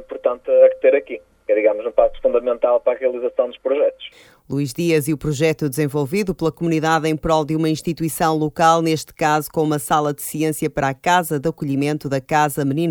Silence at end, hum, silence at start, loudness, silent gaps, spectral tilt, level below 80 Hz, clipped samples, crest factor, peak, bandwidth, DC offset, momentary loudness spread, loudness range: 0 s; none; 0 s; -19 LUFS; none; -5.5 dB/octave; -46 dBFS; under 0.1%; 18 dB; 0 dBFS; 19 kHz; under 0.1%; 7 LU; 3 LU